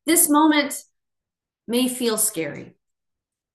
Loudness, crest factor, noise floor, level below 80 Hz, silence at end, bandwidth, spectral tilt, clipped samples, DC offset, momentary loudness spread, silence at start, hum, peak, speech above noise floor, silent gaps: -19 LUFS; 20 dB; -86 dBFS; -72 dBFS; 0.85 s; 13 kHz; -2 dB/octave; under 0.1%; under 0.1%; 16 LU; 0.05 s; none; -2 dBFS; 65 dB; none